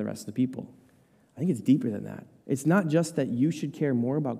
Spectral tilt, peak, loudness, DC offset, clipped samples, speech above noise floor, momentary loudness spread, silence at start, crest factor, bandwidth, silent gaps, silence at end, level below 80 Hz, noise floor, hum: -7 dB/octave; -10 dBFS; -27 LUFS; under 0.1%; under 0.1%; 34 dB; 15 LU; 0 s; 18 dB; 15 kHz; none; 0 s; -74 dBFS; -62 dBFS; none